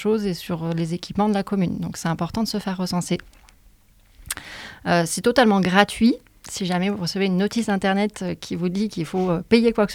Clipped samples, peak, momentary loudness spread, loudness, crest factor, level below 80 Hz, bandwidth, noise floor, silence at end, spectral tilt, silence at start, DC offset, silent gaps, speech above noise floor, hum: under 0.1%; 0 dBFS; 12 LU; -22 LUFS; 22 dB; -50 dBFS; 16.5 kHz; -54 dBFS; 0 s; -5.5 dB/octave; 0 s; under 0.1%; none; 33 dB; none